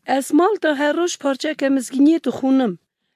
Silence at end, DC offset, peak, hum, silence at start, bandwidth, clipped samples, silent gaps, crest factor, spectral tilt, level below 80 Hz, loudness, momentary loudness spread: 0.4 s; under 0.1%; -4 dBFS; none; 0.05 s; 14.5 kHz; under 0.1%; none; 14 dB; -4 dB/octave; -70 dBFS; -18 LUFS; 6 LU